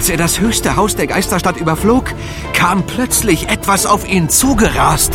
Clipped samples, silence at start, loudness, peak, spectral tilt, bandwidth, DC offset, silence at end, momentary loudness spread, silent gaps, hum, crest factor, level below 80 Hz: under 0.1%; 0 s; -13 LUFS; 0 dBFS; -3.5 dB/octave; 17 kHz; under 0.1%; 0 s; 4 LU; none; none; 14 dB; -26 dBFS